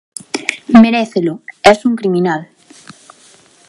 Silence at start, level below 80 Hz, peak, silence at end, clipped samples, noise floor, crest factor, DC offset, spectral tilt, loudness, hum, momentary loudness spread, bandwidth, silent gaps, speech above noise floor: 0.35 s; -52 dBFS; 0 dBFS; 1.25 s; 0.2%; -46 dBFS; 14 dB; under 0.1%; -5.5 dB/octave; -13 LUFS; none; 12 LU; 11.5 kHz; none; 35 dB